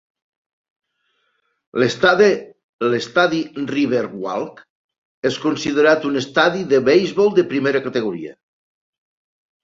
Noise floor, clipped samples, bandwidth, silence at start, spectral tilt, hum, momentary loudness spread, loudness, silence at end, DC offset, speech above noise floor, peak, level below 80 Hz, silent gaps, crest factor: -68 dBFS; under 0.1%; 7.8 kHz; 1.75 s; -5 dB/octave; none; 11 LU; -18 LUFS; 1.3 s; under 0.1%; 51 dB; -2 dBFS; -62 dBFS; 2.64-2.79 s, 4.70-4.89 s, 4.98-5.22 s; 18 dB